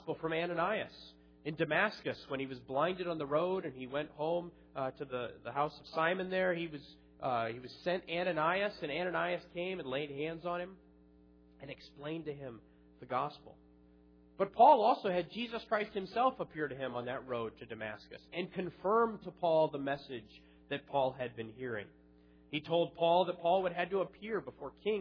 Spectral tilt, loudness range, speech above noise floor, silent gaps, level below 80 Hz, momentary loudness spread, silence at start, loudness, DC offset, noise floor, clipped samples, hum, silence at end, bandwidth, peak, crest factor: -3.5 dB/octave; 10 LU; 27 dB; none; -68 dBFS; 13 LU; 0 s; -35 LUFS; under 0.1%; -63 dBFS; under 0.1%; none; 0 s; 5.4 kHz; -12 dBFS; 24 dB